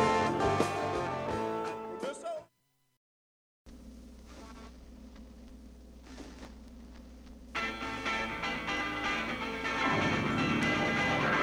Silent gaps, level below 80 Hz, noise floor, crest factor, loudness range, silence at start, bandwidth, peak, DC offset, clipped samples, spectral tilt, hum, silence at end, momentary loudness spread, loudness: 2.97-3.65 s; -54 dBFS; -75 dBFS; 20 dB; 21 LU; 0 s; over 20 kHz; -14 dBFS; under 0.1%; under 0.1%; -5 dB/octave; none; 0 s; 23 LU; -32 LUFS